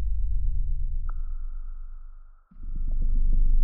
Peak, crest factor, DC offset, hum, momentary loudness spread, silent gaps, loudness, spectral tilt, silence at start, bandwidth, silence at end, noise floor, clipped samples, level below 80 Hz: -12 dBFS; 12 dB; under 0.1%; none; 18 LU; none; -33 LUFS; -12.5 dB/octave; 0 s; 1.5 kHz; 0 s; -45 dBFS; under 0.1%; -24 dBFS